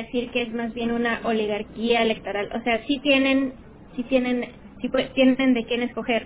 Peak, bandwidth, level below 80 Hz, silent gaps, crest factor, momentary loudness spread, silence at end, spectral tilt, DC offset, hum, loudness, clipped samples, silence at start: -6 dBFS; 4 kHz; -50 dBFS; none; 18 dB; 10 LU; 0 s; -8.5 dB/octave; under 0.1%; none; -23 LUFS; under 0.1%; 0 s